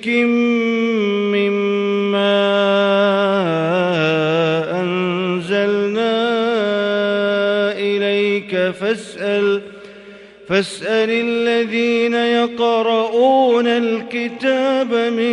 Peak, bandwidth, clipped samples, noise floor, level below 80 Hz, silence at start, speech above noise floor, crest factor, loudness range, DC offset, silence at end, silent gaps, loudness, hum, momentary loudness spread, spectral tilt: -4 dBFS; 11 kHz; under 0.1%; -39 dBFS; -64 dBFS; 0 s; 23 dB; 14 dB; 3 LU; under 0.1%; 0 s; none; -17 LUFS; none; 5 LU; -6 dB/octave